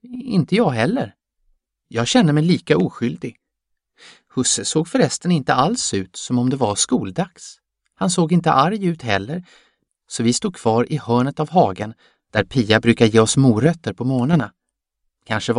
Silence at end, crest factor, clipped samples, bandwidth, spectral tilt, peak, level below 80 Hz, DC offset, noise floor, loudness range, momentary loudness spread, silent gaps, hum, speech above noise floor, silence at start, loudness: 0 s; 20 dB; under 0.1%; 11 kHz; -5 dB/octave; 0 dBFS; -52 dBFS; under 0.1%; -77 dBFS; 4 LU; 13 LU; none; none; 59 dB; 0.05 s; -18 LUFS